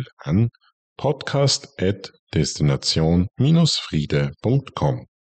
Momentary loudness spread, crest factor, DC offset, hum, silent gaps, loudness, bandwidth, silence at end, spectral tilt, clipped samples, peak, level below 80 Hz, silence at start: 7 LU; 12 dB; under 0.1%; none; 0.13-0.17 s, 0.73-0.96 s, 2.19-2.27 s; -21 LUFS; 9 kHz; 0.3 s; -5.5 dB/octave; under 0.1%; -8 dBFS; -42 dBFS; 0 s